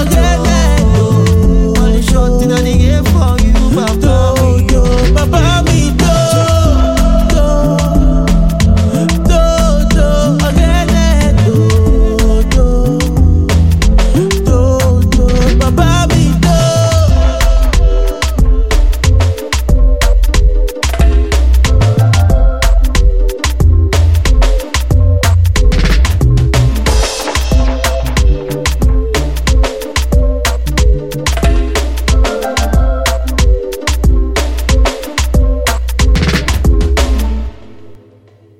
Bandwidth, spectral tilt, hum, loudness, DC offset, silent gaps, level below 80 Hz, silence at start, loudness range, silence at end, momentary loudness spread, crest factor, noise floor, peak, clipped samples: 16 kHz; -5.5 dB/octave; none; -11 LUFS; 2%; none; -12 dBFS; 0 s; 3 LU; 1.05 s; 4 LU; 8 dB; -43 dBFS; 0 dBFS; under 0.1%